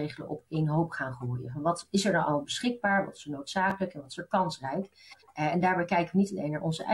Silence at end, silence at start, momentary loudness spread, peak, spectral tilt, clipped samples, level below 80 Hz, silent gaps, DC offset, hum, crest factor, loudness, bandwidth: 0 s; 0 s; 10 LU; -14 dBFS; -5.5 dB/octave; under 0.1%; -64 dBFS; none; under 0.1%; none; 16 dB; -30 LUFS; 12 kHz